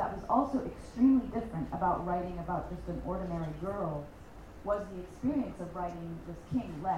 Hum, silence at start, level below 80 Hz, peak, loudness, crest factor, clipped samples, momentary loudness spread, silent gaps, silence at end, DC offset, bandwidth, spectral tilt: none; 0 s; -50 dBFS; -12 dBFS; -34 LUFS; 20 dB; under 0.1%; 14 LU; none; 0 s; under 0.1%; 10 kHz; -8.5 dB/octave